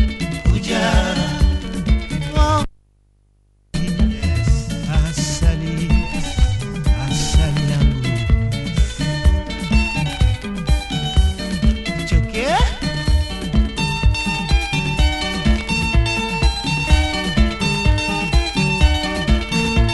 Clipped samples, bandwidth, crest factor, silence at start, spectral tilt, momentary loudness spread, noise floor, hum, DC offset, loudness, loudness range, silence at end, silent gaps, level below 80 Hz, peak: under 0.1%; 12 kHz; 16 dB; 0 s; -5 dB/octave; 4 LU; -56 dBFS; none; under 0.1%; -19 LUFS; 3 LU; 0 s; none; -20 dBFS; -2 dBFS